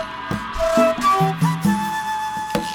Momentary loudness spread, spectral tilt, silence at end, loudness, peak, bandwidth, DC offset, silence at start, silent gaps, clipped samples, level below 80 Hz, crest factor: 9 LU; -5.5 dB/octave; 0 s; -20 LUFS; -6 dBFS; 18.5 kHz; under 0.1%; 0 s; none; under 0.1%; -40 dBFS; 14 dB